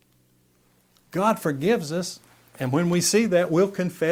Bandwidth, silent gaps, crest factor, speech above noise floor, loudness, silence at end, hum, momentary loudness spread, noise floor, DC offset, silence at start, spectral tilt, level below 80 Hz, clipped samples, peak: 16.5 kHz; none; 16 dB; 40 dB; -23 LUFS; 0 s; none; 12 LU; -62 dBFS; under 0.1%; 1.15 s; -5 dB/octave; -64 dBFS; under 0.1%; -8 dBFS